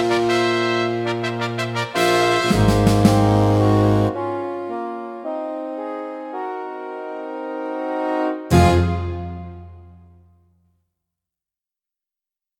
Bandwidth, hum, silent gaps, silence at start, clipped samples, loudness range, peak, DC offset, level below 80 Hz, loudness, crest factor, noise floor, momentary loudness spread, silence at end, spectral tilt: 16.5 kHz; none; none; 0 s; under 0.1%; 11 LU; 0 dBFS; under 0.1%; -38 dBFS; -20 LUFS; 20 dB; -88 dBFS; 15 LU; 2.65 s; -6 dB/octave